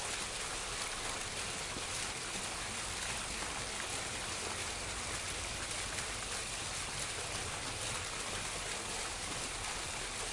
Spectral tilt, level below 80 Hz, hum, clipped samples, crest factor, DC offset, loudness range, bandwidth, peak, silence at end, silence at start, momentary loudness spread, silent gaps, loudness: -1.5 dB/octave; -54 dBFS; none; under 0.1%; 16 dB; under 0.1%; 0 LU; 12 kHz; -24 dBFS; 0 s; 0 s; 1 LU; none; -38 LUFS